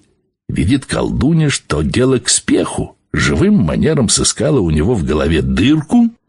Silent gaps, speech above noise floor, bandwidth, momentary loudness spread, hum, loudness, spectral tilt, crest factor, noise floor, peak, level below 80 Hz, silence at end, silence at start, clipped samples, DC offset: none; 22 dB; 11.5 kHz; 5 LU; none; -14 LUFS; -5 dB/octave; 14 dB; -35 dBFS; 0 dBFS; -28 dBFS; 0.15 s; 0.5 s; under 0.1%; under 0.1%